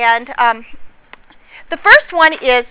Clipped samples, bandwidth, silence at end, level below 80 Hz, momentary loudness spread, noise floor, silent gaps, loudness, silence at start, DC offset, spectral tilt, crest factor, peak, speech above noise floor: 1%; 4 kHz; 0.05 s; -46 dBFS; 13 LU; -42 dBFS; none; -11 LUFS; 0 s; under 0.1%; -5 dB/octave; 14 dB; 0 dBFS; 30 dB